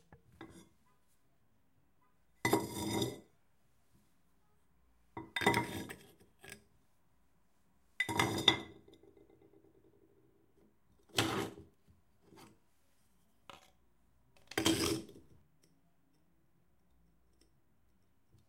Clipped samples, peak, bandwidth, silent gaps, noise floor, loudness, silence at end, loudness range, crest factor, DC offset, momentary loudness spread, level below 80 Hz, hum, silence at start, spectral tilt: under 0.1%; -10 dBFS; 16 kHz; none; -76 dBFS; -35 LUFS; 3.3 s; 6 LU; 34 dB; under 0.1%; 26 LU; -68 dBFS; none; 0.1 s; -3.5 dB/octave